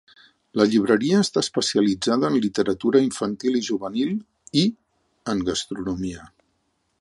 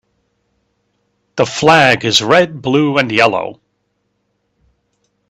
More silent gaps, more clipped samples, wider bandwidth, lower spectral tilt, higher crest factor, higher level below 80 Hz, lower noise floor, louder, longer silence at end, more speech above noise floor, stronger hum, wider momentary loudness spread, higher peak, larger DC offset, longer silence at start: neither; neither; second, 11.5 kHz vs 15 kHz; about the same, -5 dB/octave vs -4 dB/octave; about the same, 18 dB vs 16 dB; about the same, -54 dBFS vs -54 dBFS; first, -71 dBFS vs -67 dBFS; second, -22 LUFS vs -12 LUFS; second, 0.75 s vs 1.75 s; second, 49 dB vs 54 dB; second, none vs 50 Hz at -55 dBFS; about the same, 10 LU vs 11 LU; second, -4 dBFS vs 0 dBFS; neither; second, 0.55 s vs 1.35 s